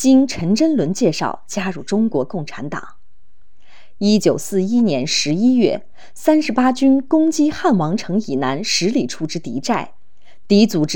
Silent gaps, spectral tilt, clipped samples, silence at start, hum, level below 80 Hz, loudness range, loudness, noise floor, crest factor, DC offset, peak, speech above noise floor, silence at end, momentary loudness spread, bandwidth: none; -5 dB/octave; under 0.1%; 0 s; none; -56 dBFS; 5 LU; -17 LUFS; -58 dBFS; 16 dB; 3%; -2 dBFS; 41 dB; 0 s; 10 LU; 17.5 kHz